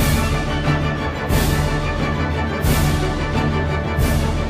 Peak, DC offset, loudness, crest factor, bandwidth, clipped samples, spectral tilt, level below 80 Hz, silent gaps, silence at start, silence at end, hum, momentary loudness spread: -6 dBFS; under 0.1%; -20 LUFS; 12 dB; 15.5 kHz; under 0.1%; -5.5 dB/octave; -26 dBFS; none; 0 s; 0 s; none; 3 LU